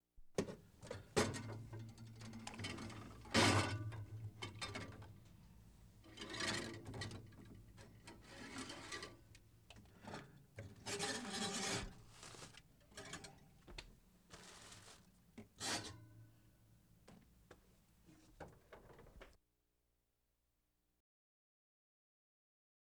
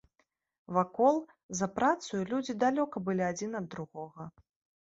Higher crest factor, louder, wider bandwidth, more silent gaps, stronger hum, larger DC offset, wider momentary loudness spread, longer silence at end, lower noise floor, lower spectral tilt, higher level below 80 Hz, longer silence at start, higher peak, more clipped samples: first, 28 dB vs 20 dB; second, -44 LUFS vs -32 LUFS; first, over 20 kHz vs 8 kHz; second, none vs 1.43-1.49 s; neither; neither; first, 23 LU vs 16 LU; first, 3.65 s vs 0.55 s; first, -85 dBFS vs -77 dBFS; second, -3.5 dB/octave vs -5.5 dB/octave; about the same, -68 dBFS vs -68 dBFS; second, 0.15 s vs 0.7 s; second, -22 dBFS vs -12 dBFS; neither